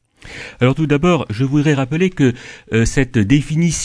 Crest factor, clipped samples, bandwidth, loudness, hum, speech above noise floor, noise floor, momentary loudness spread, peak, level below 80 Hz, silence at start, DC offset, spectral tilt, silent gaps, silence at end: 16 dB; under 0.1%; 11 kHz; -16 LUFS; none; 19 dB; -34 dBFS; 13 LU; 0 dBFS; -32 dBFS; 0.25 s; under 0.1%; -6 dB/octave; none; 0 s